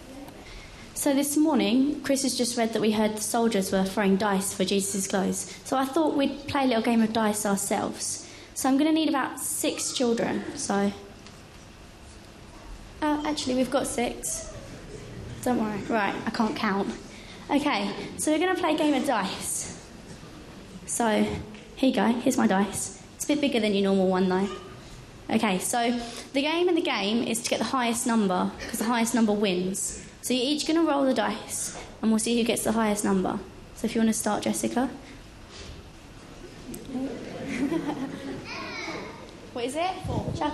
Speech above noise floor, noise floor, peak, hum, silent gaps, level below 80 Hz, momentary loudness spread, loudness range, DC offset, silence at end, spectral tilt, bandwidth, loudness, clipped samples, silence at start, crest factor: 21 dB; -47 dBFS; -10 dBFS; none; none; -52 dBFS; 20 LU; 7 LU; under 0.1%; 0 s; -4 dB/octave; 13 kHz; -26 LUFS; under 0.1%; 0 s; 18 dB